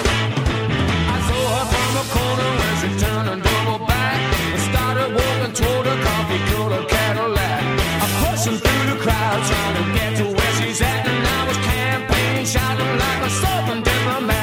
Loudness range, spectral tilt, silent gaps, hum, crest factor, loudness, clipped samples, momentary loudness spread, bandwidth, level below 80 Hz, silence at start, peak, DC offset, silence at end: 1 LU; -4.5 dB/octave; none; none; 14 dB; -19 LUFS; under 0.1%; 2 LU; 17 kHz; -28 dBFS; 0 s; -4 dBFS; under 0.1%; 0 s